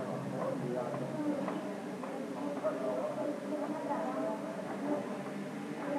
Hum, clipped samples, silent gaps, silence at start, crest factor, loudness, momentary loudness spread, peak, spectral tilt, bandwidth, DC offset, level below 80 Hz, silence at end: none; under 0.1%; none; 0 s; 14 dB; -37 LUFS; 5 LU; -22 dBFS; -6.5 dB/octave; 14.5 kHz; under 0.1%; -84 dBFS; 0 s